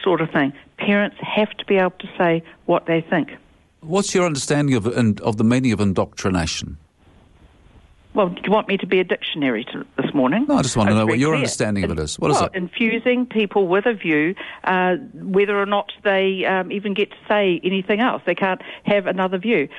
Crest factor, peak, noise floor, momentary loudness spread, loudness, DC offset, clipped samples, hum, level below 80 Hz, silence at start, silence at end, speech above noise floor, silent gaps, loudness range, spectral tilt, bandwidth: 14 dB; -6 dBFS; -52 dBFS; 6 LU; -20 LUFS; under 0.1%; under 0.1%; none; -48 dBFS; 0 s; 0 s; 32 dB; none; 4 LU; -5 dB/octave; 11.5 kHz